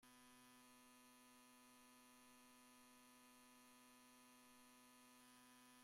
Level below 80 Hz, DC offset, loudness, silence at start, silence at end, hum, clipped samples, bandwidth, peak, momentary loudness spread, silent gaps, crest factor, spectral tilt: under -90 dBFS; under 0.1%; -68 LUFS; 0 s; 0 s; none; under 0.1%; 16 kHz; -56 dBFS; 1 LU; none; 12 dB; -1.5 dB/octave